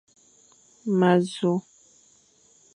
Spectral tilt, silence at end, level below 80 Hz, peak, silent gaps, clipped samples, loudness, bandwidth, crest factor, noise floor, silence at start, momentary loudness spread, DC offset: -7 dB/octave; 1.15 s; -74 dBFS; -8 dBFS; none; under 0.1%; -24 LUFS; 10.5 kHz; 20 dB; -60 dBFS; 0.85 s; 10 LU; under 0.1%